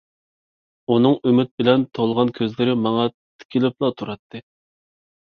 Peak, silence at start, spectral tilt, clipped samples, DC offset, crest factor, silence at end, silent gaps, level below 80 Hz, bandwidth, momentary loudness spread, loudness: -2 dBFS; 0.9 s; -9 dB/octave; under 0.1%; under 0.1%; 18 dB; 0.8 s; 1.51-1.58 s, 3.14-3.39 s, 3.45-3.49 s, 4.19-4.30 s; -62 dBFS; 5.6 kHz; 15 LU; -20 LUFS